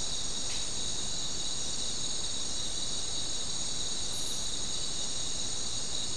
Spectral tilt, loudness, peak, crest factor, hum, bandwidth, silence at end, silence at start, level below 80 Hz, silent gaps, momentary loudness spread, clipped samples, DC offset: -1 dB/octave; -33 LUFS; -20 dBFS; 14 dB; none; 12 kHz; 0 s; 0 s; -50 dBFS; none; 0 LU; under 0.1%; 2%